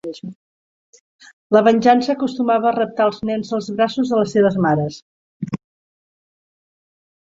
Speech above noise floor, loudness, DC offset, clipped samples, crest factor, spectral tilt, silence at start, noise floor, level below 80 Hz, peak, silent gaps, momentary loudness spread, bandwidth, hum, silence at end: over 73 dB; -18 LUFS; under 0.1%; under 0.1%; 18 dB; -6.5 dB/octave; 0.05 s; under -90 dBFS; -60 dBFS; -2 dBFS; 0.35-0.93 s, 1.00-1.19 s, 1.33-1.50 s, 5.02-5.40 s; 16 LU; 7.8 kHz; none; 1.75 s